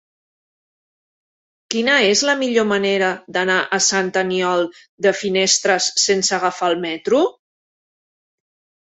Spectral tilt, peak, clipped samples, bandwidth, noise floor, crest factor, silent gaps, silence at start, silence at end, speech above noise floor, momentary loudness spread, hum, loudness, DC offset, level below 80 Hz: -2 dB/octave; -2 dBFS; under 0.1%; 8.4 kHz; under -90 dBFS; 18 dB; 4.89-4.98 s; 1.7 s; 1.5 s; over 72 dB; 6 LU; none; -17 LUFS; under 0.1%; -64 dBFS